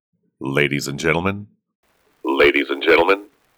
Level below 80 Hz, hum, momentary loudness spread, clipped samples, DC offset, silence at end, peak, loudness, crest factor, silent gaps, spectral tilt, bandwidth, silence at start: -50 dBFS; none; 13 LU; under 0.1%; under 0.1%; 0.35 s; 0 dBFS; -18 LUFS; 20 dB; 1.75-1.83 s; -5 dB/octave; over 20 kHz; 0.4 s